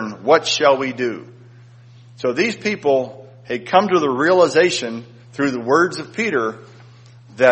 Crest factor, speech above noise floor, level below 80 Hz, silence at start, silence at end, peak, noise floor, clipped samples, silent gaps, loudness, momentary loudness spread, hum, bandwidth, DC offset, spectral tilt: 18 dB; 26 dB; -64 dBFS; 0 s; 0 s; 0 dBFS; -44 dBFS; under 0.1%; none; -18 LUFS; 14 LU; none; 8.4 kHz; under 0.1%; -4 dB/octave